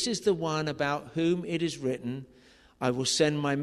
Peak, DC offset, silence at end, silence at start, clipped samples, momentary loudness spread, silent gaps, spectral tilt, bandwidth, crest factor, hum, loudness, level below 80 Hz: -12 dBFS; under 0.1%; 0 s; 0 s; under 0.1%; 8 LU; none; -4.5 dB/octave; 13.5 kHz; 18 dB; none; -29 LUFS; -62 dBFS